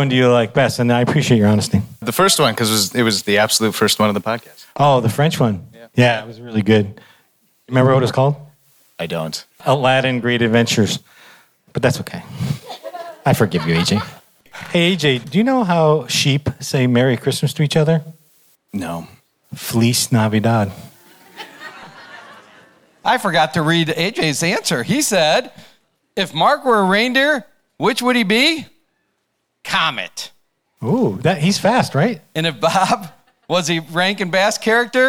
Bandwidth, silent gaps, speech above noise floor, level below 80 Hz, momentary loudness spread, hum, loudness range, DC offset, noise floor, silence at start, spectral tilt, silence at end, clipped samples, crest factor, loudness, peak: over 20 kHz; none; 54 dB; -54 dBFS; 14 LU; none; 5 LU; under 0.1%; -70 dBFS; 0 s; -4.5 dB/octave; 0 s; under 0.1%; 14 dB; -16 LUFS; -2 dBFS